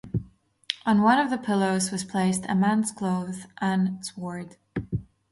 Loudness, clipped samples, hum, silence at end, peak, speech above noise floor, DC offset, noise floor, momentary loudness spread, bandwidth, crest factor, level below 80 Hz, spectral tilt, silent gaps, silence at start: -26 LUFS; under 0.1%; none; 0.3 s; -4 dBFS; 24 dB; under 0.1%; -49 dBFS; 14 LU; 11.5 kHz; 22 dB; -52 dBFS; -5 dB/octave; none; 0.05 s